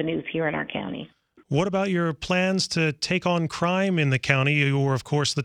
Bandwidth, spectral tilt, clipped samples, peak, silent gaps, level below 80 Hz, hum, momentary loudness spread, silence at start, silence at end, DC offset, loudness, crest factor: 11 kHz; -5.5 dB/octave; under 0.1%; -2 dBFS; none; -56 dBFS; none; 8 LU; 0 s; 0 s; under 0.1%; -24 LUFS; 22 dB